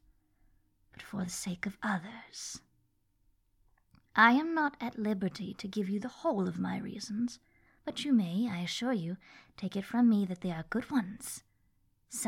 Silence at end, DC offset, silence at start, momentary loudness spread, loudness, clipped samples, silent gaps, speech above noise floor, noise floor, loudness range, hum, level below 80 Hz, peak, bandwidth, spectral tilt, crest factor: 0 s; under 0.1%; 1 s; 15 LU; -33 LUFS; under 0.1%; none; 42 dB; -74 dBFS; 10 LU; none; -68 dBFS; -10 dBFS; 16.5 kHz; -5 dB/octave; 24 dB